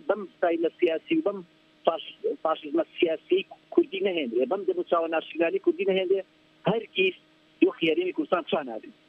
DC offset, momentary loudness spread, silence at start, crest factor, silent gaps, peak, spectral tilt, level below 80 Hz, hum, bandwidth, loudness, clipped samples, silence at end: under 0.1%; 5 LU; 0.05 s; 20 dB; none; -6 dBFS; -8 dB/octave; -78 dBFS; none; 4.5 kHz; -27 LUFS; under 0.1%; 0.2 s